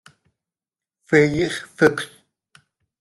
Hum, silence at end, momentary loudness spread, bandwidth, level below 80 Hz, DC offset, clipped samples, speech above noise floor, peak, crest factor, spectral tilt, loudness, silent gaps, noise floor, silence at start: none; 0.95 s; 13 LU; 12.5 kHz; -56 dBFS; under 0.1%; under 0.1%; over 71 dB; -2 dBFS; 20 dB; -5.5 dB/octave; -19 LUFS; none; under -90 dBFS; 1.1 s